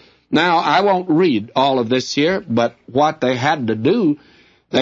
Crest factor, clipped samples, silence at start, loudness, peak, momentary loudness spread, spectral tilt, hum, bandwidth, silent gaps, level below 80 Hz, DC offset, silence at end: 16 dB; under 0.1%; 0.3 s; -17 LUFS; -2 dBFS; 5 LU; -5.5 dB/octave; none; 7.8 kHz; none; -60 dBFS; under 0.1%; 0 s